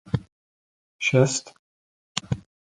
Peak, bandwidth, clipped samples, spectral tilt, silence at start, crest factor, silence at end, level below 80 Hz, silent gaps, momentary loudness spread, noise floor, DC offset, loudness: -2 dBFS; 11 kHz; under 0.1%; -4.5 dB/octave; 0.15 s; 26 dB; 0.35 s; -52 dBFS; 0.32-0.99 s, 1.59-2.15 s; 13 LU; under -90 dBFS; under 0.1%; -25 LUFS